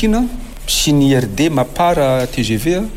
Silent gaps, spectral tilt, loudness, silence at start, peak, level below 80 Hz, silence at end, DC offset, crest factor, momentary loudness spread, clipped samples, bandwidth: none; -5 dB/octave; -15 LUFS; 0 s; -4 dBFS; -28 dBFS; 0 s; under 0.1%; 12 dB; 6 LU; under 0.1%; 16.5 kHz